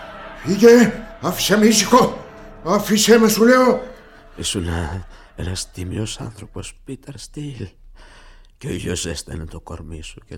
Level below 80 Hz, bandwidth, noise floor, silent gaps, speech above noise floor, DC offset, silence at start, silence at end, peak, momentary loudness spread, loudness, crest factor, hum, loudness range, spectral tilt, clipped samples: -40 dBFS; 17.5 kHz; -44 dBFS; none; 27 dB; under 0.1%; 0 s; 0 s; 0 dBFS; 22 LU; -16 LUFS; 18 dB; none; 15 LU; -4 dB/octave; under 0.1%